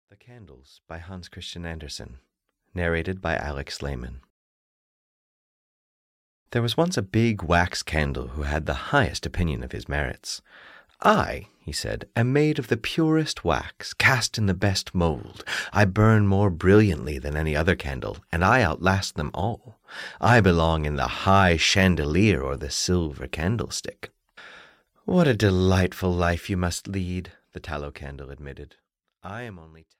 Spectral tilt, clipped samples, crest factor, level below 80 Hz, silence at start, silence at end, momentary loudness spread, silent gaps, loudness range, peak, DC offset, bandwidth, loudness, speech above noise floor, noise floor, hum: -5.5 dB/octave; under 0.1%; 20 dB; -40 dBFS; 0.3 s; 0.3 s; 19 LU; 4.30-6.46 s; 10 LU; -6 dBFS; under 0.1%; 16 kHz; -24 LUFS; 30 dB; -54 dBFS; none